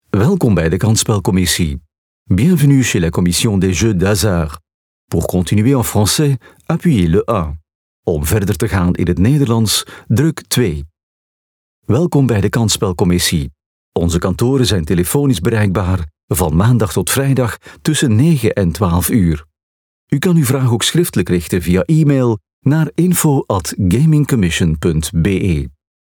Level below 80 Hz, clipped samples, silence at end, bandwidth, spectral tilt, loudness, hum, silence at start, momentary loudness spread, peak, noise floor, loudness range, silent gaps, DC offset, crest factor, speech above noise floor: -34 dBFS; under 0.1%; 0.3 s; over 20 kHz; -5.5 dB/octave; -14 LUFS; none; 0.15 s; 7 LU; -2 dBFS; under -90 dBFS; 2 LU; 1.98-2.26 s, 4.74-5.08 s, 7.75-8.03 s, 11.03-11.82 s, 13.66-13.92 s, 16.23-16.28 s, 19.63-20.07 s, 22.53-22.62 s; under 0.1%; 12 dB; over 77 dB